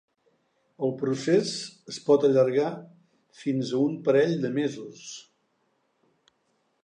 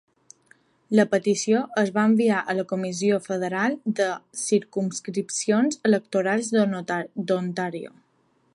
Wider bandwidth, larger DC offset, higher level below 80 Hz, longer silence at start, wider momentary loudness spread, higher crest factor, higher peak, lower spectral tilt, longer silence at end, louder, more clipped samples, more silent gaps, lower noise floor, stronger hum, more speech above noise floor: second, 9.8 kHz vs 11.5 kHz; neither; about the same, -80 dBFS vs -76 dBFS; about the same, 0.8 s vs 0.9 s; first, 18 LU vs 8 LU; about the same, 18 dB vs 18 dB; second, -10 dBFS vs -6 dBFS; about the same, -6 dB/octave vs -5 dB/octave; first, 1.65 s vs 0.65 s; about the same, -25 LUFS vs -24 LUFS; neither; neither; first, -72 dBFS vs -66 dBFS; neither; first, 47 dB vs 42 dB